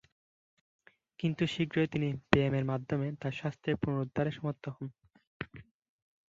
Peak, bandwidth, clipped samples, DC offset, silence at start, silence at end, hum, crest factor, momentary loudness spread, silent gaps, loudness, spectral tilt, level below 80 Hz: -6 dBFS; 7.8 kHz; under 0.1%; under 0.1%; 1.2 s; 0.65 s; none; 28 dB; 16 LU; 5.27-5.40 s; -33 LUFS; -7.5 dB/octave; -60 dBFS